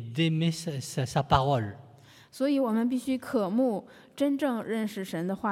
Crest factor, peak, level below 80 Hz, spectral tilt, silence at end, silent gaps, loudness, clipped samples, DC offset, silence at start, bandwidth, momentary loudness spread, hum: 22 dB; -8 dBFS; -56 dBFS; -6.5 dB/octave; 0 s; none; -29 LUFS; under 0.1%; under 0.1%; 0 s; 15.5 kHz; 8 LU; none